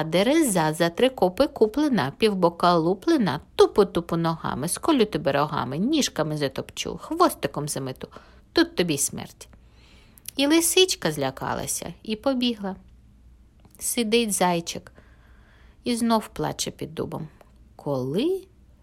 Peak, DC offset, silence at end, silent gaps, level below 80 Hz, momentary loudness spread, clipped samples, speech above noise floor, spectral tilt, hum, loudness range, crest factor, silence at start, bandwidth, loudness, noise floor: -4 dBFS; under 0.1%; 0.4 s; none; -52 dBFS; 13 LU; under 0.1%; 29 dB; -4 dB/octave; none; 6 LU; 20 dB; 0 s; 16 kHz; -24 LUFS; -52 dBFS